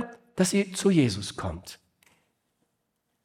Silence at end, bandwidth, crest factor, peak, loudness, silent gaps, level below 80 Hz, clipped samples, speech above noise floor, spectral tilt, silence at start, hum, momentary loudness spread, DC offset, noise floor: 1.5 s; 16 kHz; 18 dB; -10 dBFS; -26 LUFS; none; -58 dBFS; under 0.1%; 52 dB; -5 dB/octave; 0 s; none; 16 LU; under 0.1%; -78 dBFS